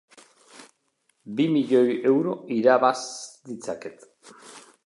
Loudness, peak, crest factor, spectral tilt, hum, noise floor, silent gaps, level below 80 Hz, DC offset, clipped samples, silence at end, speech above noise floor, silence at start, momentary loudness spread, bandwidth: -23 LUFS; -6 dBFS; 20 dB; -5.5 dB/octave; none; -71 dBFS; none; -78 dBFS; under 0.1%; under 0.1%; 0.25 s; 47 dB; 0.6 s; 18 LU; 11.5 kHz